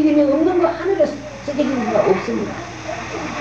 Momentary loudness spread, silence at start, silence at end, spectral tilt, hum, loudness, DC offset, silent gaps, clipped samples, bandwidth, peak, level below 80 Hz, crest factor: 12 LU; 0 s; 0 s; -6 dB/octave; none; -19 LUFS; 0.2%; none; under 0.1%; 8 kHz; -4 dBFS; -46 dBFS; 14 dB